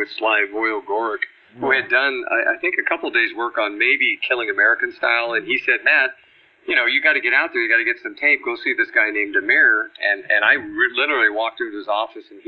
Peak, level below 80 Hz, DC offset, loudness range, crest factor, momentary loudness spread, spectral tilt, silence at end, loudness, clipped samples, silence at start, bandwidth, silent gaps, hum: -2 dBFS; -68 dBFS; under 0.1%; 2 LU; 16 dB; 8 LU; -5.5 dB/octave; 0.05 s; -18 LUFS; under 0.1%; 0 s; 5.6 kHz; none; none